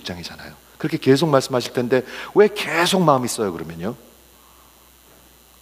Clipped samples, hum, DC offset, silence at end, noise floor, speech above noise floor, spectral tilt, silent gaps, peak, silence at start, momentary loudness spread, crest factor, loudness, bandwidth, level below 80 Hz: under 0.1%; none; under 0.1%; 1.65 s; -50 dBFS; 31 dB; -5 dB/octave; none; 0 dBFS; 0.05 s; 16 LU; 20 dB; -19 LUFS; 16 kHz; -56 dBFS